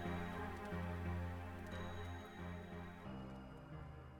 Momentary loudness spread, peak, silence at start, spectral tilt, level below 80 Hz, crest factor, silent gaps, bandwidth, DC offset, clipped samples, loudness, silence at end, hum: 9 LU; -32 dBFS; 0 s; -7 dB/octave; -58 dBFS; 14 dB; none; 17.5 kHz; under 0.1%; under 0.1%; -49 LUFS; 0 s; none